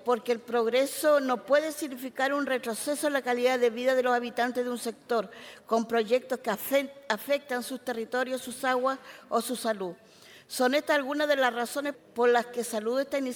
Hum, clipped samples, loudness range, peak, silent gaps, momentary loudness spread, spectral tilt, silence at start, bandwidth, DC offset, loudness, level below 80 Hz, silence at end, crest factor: none; under 0.1%; 3 LU; -10 dBFS; none; 9 LU; -3 dB/octave; 0 s; 19.5 kHz; under 0.1%; -28 LUFS; -78 dBFS; 0 s; 18 dB